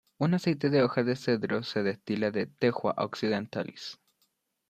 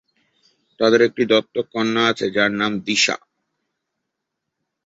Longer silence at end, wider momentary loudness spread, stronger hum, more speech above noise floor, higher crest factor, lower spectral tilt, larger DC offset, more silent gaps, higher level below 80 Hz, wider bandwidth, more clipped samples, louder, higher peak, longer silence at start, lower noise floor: second, 0.75 s vs 1.7 s; first, 10 LU vs 6 LU; neither; second, 46 dB vs 61 dB; about the same, 18 dB vs 20 dB; first, -7 dB/octave vs -3.5 dB/octave; neither; neither; second, -70 dBFS vs -62 dBFS; first, 14 kHz vs 8 kHz; neither; second, -29 LUFS vs -18 LUFS; second, -10 dBFS vs -2 dBFS; second, 0.2 s vs 0.8 s; second, -75 dBFS vs -80 dBFS